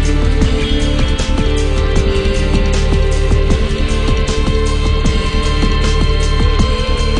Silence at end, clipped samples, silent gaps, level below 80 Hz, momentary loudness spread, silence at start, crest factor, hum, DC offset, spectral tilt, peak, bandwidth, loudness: 0 s; under 0.1%; none; -14 dBFS; 2 LU; 0 s; 12 dB; none; under 0.1%; -5.5 dB/octave; 0 dBFS; 10.5 kHz; -15 LUFS